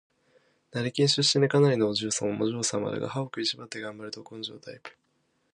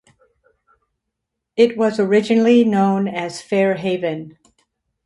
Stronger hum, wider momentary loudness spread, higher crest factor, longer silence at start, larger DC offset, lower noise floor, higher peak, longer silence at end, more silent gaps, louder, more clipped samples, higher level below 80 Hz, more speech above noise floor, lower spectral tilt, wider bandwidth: neither; first, 17 LU vs 12 LU; about the same, 20 dB vs 16 dB; second, 0.75 s vs 1.55 s; neither; second, -72 dBFS vs -79 dBFS; second, -10 dBFS vs -2 dBFS; about the same, 0.65 s vs 0.75 s; neither; second, -27 LUFS vs -17 LUFS; neither; about the same, -68 dBFS vs -64 dBFS; second, 45 dB vs 63 dB; second, -4 dB/octave vs -6.5 dB/octave; about the same, 11 kHz vs 11.5 kHz